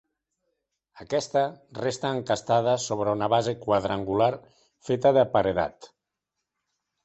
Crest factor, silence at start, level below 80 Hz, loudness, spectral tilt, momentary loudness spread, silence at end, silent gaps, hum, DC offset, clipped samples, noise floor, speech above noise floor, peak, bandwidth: 20 dB; 0.95 s; -58 dBFS; -25 LUFS; -5 dB/octave; 9 LU; 1.2 s; none; none; under 0.1%; under 0.1%; -84 dBFS; 59 dB; -8 dBFS; 8.4 kHz